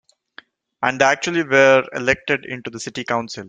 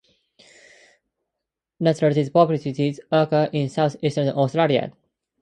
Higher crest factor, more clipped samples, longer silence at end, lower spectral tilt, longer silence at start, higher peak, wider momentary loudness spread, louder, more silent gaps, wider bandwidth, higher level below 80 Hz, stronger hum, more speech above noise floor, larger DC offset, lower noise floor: about the same, 18 dB vs 20 dB; neither; second, 0 s vs 0.5 s; second, -4 dB/octave vs -7.5 dB/octave; second, 0.8 s vs 1.8 s; about the same, -2 dBFS vs -2 dBFS; first, 15 LU vs 5 LU; first, -18 LUFS vs -21 LUFS; neither; about the same, 9.2 kHz vs 9.4 kHz; first, -56 dBFS vs -64 dBFS; neither; second, 29 dB vs 64 dB; neither; second, -47 dBFS vs -84 dBFS